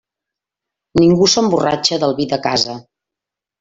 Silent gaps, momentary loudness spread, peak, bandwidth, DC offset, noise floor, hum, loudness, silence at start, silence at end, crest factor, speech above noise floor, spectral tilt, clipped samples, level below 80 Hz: none; 9 LU; -2 dBFS; 8 kHz; under 0.1%; -85 dBFS; none; -15 LUFS; 0.95 s; 0.8 s; 16 dB; 71 dB; -4.5 dB/octave; under 0.1%; -48 dBFS